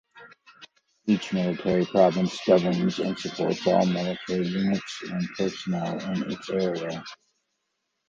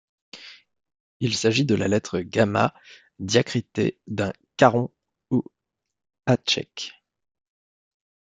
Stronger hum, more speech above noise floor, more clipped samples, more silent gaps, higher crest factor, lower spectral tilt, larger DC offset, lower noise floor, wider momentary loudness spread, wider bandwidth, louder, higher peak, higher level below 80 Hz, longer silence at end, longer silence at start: neither; second, 53 dB vs 61 dB; neither; second, none vs 1.00-1.20 s; about the same, 20 dB vs 24 dB; first, -6.5 dB/octave vs -5 dB/octave; neither; second, -78 dBFS vs -84 dBFS; second, 10 LU vs 17 LU; second, 7.6 kHz vs 9.4 kHz; second, -26 LUFS vs -23 LUFS; second, -6 dBFS vs -2 dBFS; about the same, -62 dBFS vs -62 dBFS; second, 0.95 s vs 1.4 s; second, 0.15 s vs 0.35 s